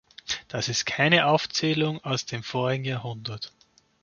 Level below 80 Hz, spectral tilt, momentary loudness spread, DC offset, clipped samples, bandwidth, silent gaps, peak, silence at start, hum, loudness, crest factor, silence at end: -62 dBFS; -4 dB/octave; 14 LU; under 0.1%; under 0.1%; 7.2 kHz; none; -4 dBFS; 0.25 s; none; -25 LUFS; 24 dB; 0.55 s